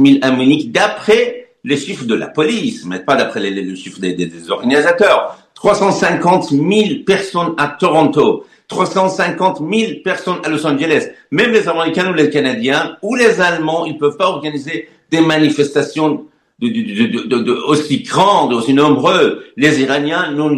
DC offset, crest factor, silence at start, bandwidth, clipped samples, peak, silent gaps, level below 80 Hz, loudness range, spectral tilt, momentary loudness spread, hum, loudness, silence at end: under 0.1%; 14 dB; 0 s; 12 kHz; under 0.1%; 0 dBFS; none; -56 dBFS; 3 LU; -5 dB/octave; 9 LU; none; -14 LUFS; 0 s